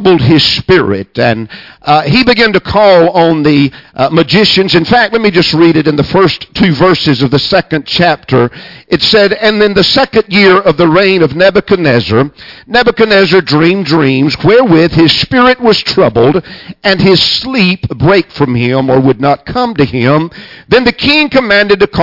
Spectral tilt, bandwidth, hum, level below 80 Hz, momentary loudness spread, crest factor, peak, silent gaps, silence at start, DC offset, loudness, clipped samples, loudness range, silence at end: -6.5 dB/octave; 6 kHz; none; -36 dBFS; 6 LU; 8 dB; 0 dBFS; none; 0 s; under 0.1%; -8 LUFS; 0.2%; 2 LU; 0 s